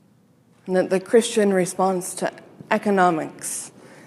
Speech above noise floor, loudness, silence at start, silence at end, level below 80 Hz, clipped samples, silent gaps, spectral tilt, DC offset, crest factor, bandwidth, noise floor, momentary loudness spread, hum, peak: 36 dB; -22 LUFS; 0.65 s; 0.35 s; -74 dBFS; under 0.1%; none; -4.5 dB/octave; under 0.1%; 20 dB; 15 kHz; -57 dBFS; 11 LU; none; -4 dBFS